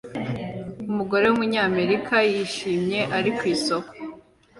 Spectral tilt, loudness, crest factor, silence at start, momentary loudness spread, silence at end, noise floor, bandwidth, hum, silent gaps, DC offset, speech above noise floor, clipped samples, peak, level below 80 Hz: -5 dB/octave; -23 LUFS; 16 dB; 0.05 s; 14 LU; 0.4 s; -46 dBFS; 11.5 kHz; none; none; under 0.1%; 24 dB; under 0.1%; -8 dBFS; -58 dBFS